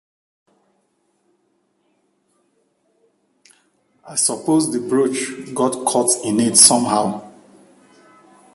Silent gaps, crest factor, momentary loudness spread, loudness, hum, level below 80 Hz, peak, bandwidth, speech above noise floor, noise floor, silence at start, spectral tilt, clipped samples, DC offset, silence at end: none; 22 dB; 15 LU; -16 LUFS; none; -64 dBFS; 0 dBFS; 16 kHz; 49 dB; -66 dBFS; 4.05 s; -2.5 dB/octave; under 0.1%; under 0.1%; 1.25 s